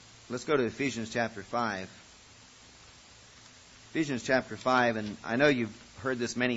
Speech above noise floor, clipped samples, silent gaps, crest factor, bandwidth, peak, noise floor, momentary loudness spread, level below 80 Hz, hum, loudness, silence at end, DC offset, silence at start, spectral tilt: 25 dB; under 0.1%; none; 20 dB; 8 kHz; -12 dBFS; -55 dBFS; 12 LU; -64 dBFS; none; -30 LUFS; 0 s; under 0.1%; 0.3 s; -4.5 dB/octave